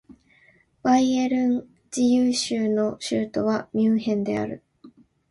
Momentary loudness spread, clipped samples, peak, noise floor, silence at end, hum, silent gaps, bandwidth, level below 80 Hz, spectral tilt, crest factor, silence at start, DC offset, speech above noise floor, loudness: 9 LU; under 0.1%; -8 dBFS; -59 dBFS; 0.4 s; none; none; 11.5 kHz; -62 dBFS; -5 dB/octave; 16 dB; 0.1 s; under 0.1%; 37 dB; -23 LUFS